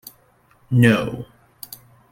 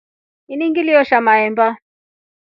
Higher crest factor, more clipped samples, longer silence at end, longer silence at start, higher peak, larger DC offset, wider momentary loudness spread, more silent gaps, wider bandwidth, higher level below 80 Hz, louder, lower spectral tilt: about the same, 20 dB vs 16 dB; neither; first, 0.85 s vs 0.65 s; first, 0.7 s vs 0.5 s; about the same, -2 dBFS vs 0 dBFS; neither; first, 25 LU vs 13 LU; neither; first, 17 kHz vs 5.8 kHz; first, -54 dBFS vs -68 dBFS; second, -18 LUFS vs -14 LUFS; about the same, -7 dB/octave vs -7 dB/octave